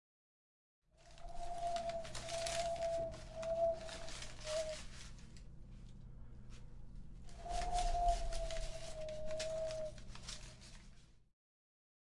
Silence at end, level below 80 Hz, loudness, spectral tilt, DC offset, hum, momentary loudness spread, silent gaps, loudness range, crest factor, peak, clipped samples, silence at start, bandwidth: 0.9 s; -50 dBFS; -43 LUFS; -3.5 dB/octave; under 0.1%; none; 20 LU; none; 7 LU; 20 dB; -22 dBFS; under 0.1%; 1 s; 11.5 kHz